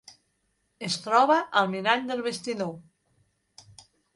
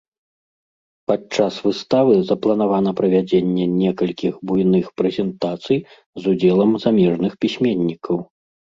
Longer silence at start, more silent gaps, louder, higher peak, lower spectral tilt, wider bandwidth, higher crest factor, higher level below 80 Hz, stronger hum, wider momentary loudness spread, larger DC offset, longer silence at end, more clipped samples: second, 0.8 s vs 1.1 s; second, none vs 6.06-6.13 s; second, -25 LUFS vs -19 LUFS; second, -6 dBFS vs -2 dBFS; second, -4 dB/octave vs -7.5 dB/octave; first, 11.5 kHz vs 7.6 kHz; first, 22 dB vs 16 dB; second, -72 dBFS vs -56 dBFS; neither; first, 14 LU vs 8 LU; neither; first, 1.35 s vs 0.5 s; neither